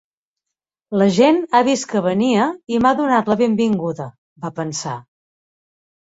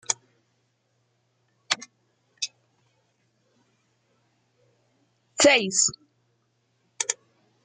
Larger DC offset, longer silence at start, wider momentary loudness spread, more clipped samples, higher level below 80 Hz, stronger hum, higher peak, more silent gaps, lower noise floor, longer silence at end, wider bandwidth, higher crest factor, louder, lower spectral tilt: neither; first, 0.9 s vs 0.1 s; about the same, 16 LU vs 16 LU; neither; first, -56 dBFS vs -74 dBFS; neither; first, -2 dBFS vs -6 dBFS; first, 4.18-4.36 s vs none; first, -84 dBFS vs -71 dBFS; first, 1.1 s vs 0.5 s; second, 8 kHz vs 9.8 kHz; second, 16 dB vs 24 dB; first, -17 LUFS vs -24 LUFS; first, -5.5 dB/octave vs -1 dB/octave